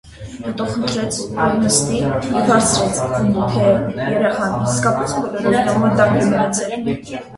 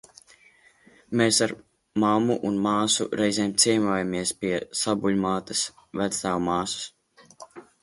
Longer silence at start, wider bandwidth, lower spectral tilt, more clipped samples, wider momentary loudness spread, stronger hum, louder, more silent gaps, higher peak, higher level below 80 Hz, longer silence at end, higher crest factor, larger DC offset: second, 0.05 s vs 1.1 s; about the same, 11.5 kHz vs 12 kHz; about the same, -4.5 dB/octave vs -3.5 dB/octave; neither; about the same, 8 LU vs 10 LU; neither; first, -17 LUFS vs -24 LUFS; neither; first, 0 dBFS vs -6 dBFS; first, -42 dBFS vs -60 dBFS; second, 0 s vs 0.2 s; about the same, 16 dB vs 20 dB; neither